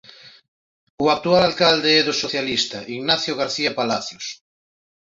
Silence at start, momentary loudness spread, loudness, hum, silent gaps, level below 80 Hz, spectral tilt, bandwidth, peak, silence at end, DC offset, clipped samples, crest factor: 0.25 s; 10 LU; -19 LUFS; none; 0.48-0.98 s; -58 dBFS; -3.5 dB/octave; 7.8 kHz; -2 dBFS; 0.7 s; under 0.1%; under 0.1%; 20 dB